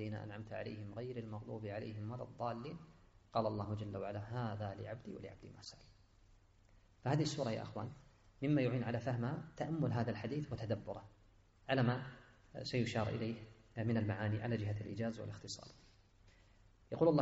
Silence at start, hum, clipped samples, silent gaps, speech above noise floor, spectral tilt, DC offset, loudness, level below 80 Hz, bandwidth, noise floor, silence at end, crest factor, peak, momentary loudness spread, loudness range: 0 s; none; under 0.1%; none; 27 dB; -6.5 dB/octave; under 0.1%; -41 LUFS; -66 dBFS; 7.6 kHz; -67 dBFS; 0 s; 22 dB; -20 dBFS; 15 LU; 5 LU